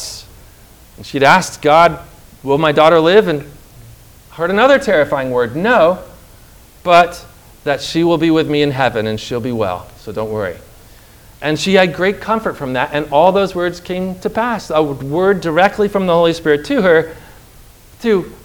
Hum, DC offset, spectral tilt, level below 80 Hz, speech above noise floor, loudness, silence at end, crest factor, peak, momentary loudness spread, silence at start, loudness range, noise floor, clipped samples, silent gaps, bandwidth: none; under 0.1%; -5.5 dB/octave; -44 dBFS; 28 dB; -14 LUFS; 0.1 s; 14 dB; 0 dBFS; 14 LU; 0 s; 5 LU; -42 dBFS; 0.2%; none; over 20 kHz